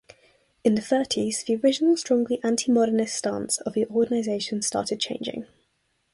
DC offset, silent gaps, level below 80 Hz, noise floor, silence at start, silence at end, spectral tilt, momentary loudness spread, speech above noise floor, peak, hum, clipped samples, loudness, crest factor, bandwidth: under 0.1%; none; -64 dBFS; -71 dBFS; 0.65 s; 0.7 s; -3.5 dB/octave; 7 LU; 48 dB; -8 dBFS; none; under 0.1%; -24 LUFS; 16 dB; 11.5 kHz